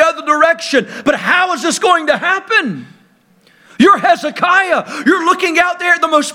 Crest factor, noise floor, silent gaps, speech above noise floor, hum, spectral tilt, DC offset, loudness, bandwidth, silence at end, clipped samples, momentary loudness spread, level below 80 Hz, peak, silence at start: 14 dB; -51 dBFS; none; 38 dB; none; -3 dB/octave; under 0.1%; -12 LUFS; 16.5 kHz; 0 s; under 0.1%; 5 LU; -58 dBFS; 0 dBFS; 0 s